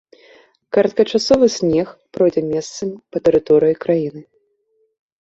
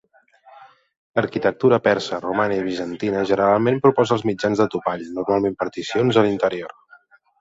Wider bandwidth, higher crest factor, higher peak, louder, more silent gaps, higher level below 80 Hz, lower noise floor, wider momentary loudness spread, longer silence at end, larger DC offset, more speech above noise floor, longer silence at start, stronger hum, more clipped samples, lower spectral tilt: about the same, 8 kHz vs 7.8 kHz; about the same, 16 dB vs 18 dB; about the same, -2 dBFS vs -2 dBFS; first, -17 LUFS vs -20 LUFS; second, none vs 0.97-1.14 s; first, -52 dBFS vs -58 dBFS; first, -64 dBFS vs -53 dBFS; first, 12 LU vs 9 LU; first, 1 s vs 0.75 s; neither; first, 48 dB vs 34 dB; first, 0.75 s vs 0.55 s; neither; neither; about the same, -5.5 dB/octave vs -6.5 dB/octave